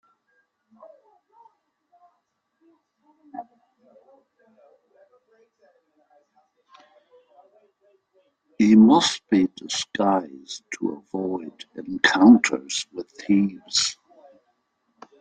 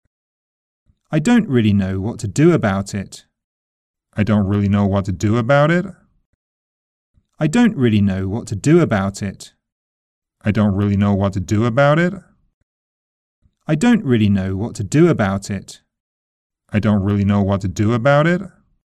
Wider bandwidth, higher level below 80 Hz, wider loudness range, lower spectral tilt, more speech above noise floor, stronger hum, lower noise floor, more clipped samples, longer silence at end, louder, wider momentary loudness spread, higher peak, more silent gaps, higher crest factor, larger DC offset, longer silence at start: second, 9.4 kHz vs 11.5 kHz; second, -66 dBFS vs -48 dBFS; about the same, 2 LU vs 1 LU; second, -4 dB/octave vs -7 dB/octave; second, 53 dB vs over 74 dB; neither; second, -74 dBFS vs under -90 dBFS; neither; first, 1.3 s vs 0.45 s; second, -20 LUFS vs -17 LUFS; first, 24 LU vs 11 LU; about the same, -2 dBFS vs -2 dBFS; second, none vs 3.44-3.94 s, 6.26-7.14 s, 9.72-10.22 s, 12.54-13.42 s, 16.00-16.50 s; first, 22 dB vs 16 dB; neither; first, 3.35 s vs 1.1 s